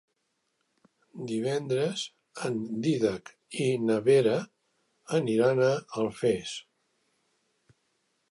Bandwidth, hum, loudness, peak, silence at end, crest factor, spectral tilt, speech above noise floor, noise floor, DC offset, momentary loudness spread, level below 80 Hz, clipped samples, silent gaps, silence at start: 11.5 kHz; none; -28 LUFS; -12 dBFS; 1.7 s; 18 dB; -6 dB/octave; 51 dB; -78 dBFS; under 0.1%; 15 LU; -70 dBFS; under 0.1%; none; 1.15 s